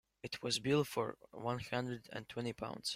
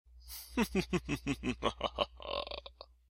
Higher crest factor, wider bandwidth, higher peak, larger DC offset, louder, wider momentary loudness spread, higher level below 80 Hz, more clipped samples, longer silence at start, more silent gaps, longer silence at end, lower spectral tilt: second, 18 dB vs 24 dB; about the same, 16 kHz vs 16.5 kHz; second, -20 dBFS vs -14 dBFS; neither; about the same, -39 LUFS vs -37 LUFS; about the same, 11 LU vs 13 LU; second, -70 dBFS vs -52 dBFS; neither; first, 0.25 s vs 0.1 s; neither; second, 0 s vs 0.25 s; about the same, -4.5 dB/octave vs -5 dB/octave